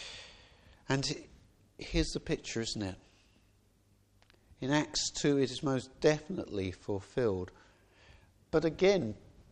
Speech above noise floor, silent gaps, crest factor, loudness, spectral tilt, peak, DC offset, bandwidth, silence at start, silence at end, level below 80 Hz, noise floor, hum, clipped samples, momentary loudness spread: 35 dB; none; 22 dB; -33 LUFS; -4.5 dB/octave; -14 dBFS; under 0.1%; 10.5 kHz; 0 s; 0.1 s; -52 dBFS; -68 dBFS; none; under 0.1%; 16 LU